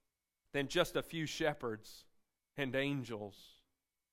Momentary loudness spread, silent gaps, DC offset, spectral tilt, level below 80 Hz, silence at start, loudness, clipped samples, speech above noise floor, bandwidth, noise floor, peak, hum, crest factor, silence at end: 16 LU; none; under 0.1%; -4.5 dB/octave; -64 dBFS; 0.55 s; -39 LUFS; under 0.1%; 48 dB; 16 kHz; -86 dBFS; -18 dBFS; none; 22 dB; 0.6 s